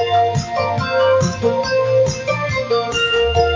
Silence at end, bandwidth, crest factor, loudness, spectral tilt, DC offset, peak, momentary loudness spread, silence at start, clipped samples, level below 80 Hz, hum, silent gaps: 0 s; 7.6 kHz; 14 dB; -17 LUFS; -4.5 dB/octave; under 0.1%; -2 dBFS; 5 LU; 0 s; under 0.1%; -34 dBFS; none; none